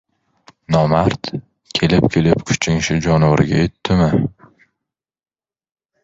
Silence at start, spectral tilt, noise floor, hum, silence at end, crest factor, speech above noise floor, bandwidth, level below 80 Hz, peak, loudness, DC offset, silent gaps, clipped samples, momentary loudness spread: 0.7 s; -6 dB/octave; -82 dBFS; none; 1.75 s; 18 dB; 67 dB; 7.8 kHz; -38 dBFS; 0 dBFS; -16 LUFS; under 0.1%; none; under 0.1%; 10 LU